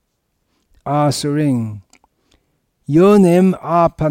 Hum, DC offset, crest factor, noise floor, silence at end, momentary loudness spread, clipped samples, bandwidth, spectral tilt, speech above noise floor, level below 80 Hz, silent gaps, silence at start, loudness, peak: none; under 0.1%; 12 dB; -68 dBFS; 0 s; 20 LU; under 0.1%; 16 kHz; -7 dB/octave; 55 dB; -48 dBFS; none; 0.85 s; -14 LUFS; -4 dBFS